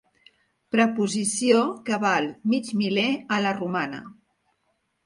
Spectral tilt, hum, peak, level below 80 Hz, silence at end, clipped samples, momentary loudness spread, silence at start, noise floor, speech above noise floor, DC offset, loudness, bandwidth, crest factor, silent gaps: -4 dB/octave; none; -6 dBFS; -70 dBFS; 0.95 s; under 0.1%; 7 LU; 0.75 s; -73 dBFS; 49 dB; under 0.1%; -24 LUFS; 11.5 kHz; 18 dB; none